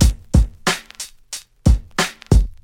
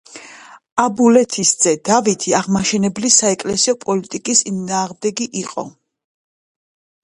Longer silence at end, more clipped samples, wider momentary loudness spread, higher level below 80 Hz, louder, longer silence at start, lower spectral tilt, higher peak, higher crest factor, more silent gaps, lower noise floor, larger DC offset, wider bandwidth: second, 0.1 s vs 1.35 s; neither; first, 15 LU vs 12 LU; first, -20 dBFS vs -56 dBFS; second, -19 LUFS vs -16 LUFS; second, 0 s vs 0.15 s; first, -5 dB/octave vs -3 dB/octave; about the same, 0 dBFS vs 0 dBFS; about the same, 18 dB vs 18 dB; second, none vs 0.72-0.76 s; second, -37 dBFS vs -41 dBFS; neither; first, 16 kHz vs 11.5 kHz